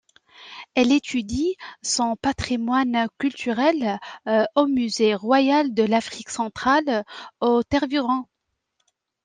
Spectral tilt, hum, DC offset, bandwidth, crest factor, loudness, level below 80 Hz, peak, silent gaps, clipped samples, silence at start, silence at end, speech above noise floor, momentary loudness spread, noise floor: -4 dB/octave; none; under 0.1%; 10 kHz; 18 dB; -22 LUFS; -52 dBFS; -4 dBFS; none; under 0.1%; 0.4 s; 1 s; 53 dB; 8 LU; -75 dBFS